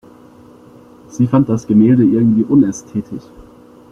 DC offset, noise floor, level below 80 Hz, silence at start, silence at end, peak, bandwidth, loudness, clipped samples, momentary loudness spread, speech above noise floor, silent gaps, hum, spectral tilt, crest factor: under 0.1%; -42 dBFS; -50 dBFS; 1.15 s; 0.7 s; -2 dBFS; 7.8 kHz; -13 LUFS; under 0.1%; 18 LU; 29 dB; none; none; -9 dB/octave; 14 dB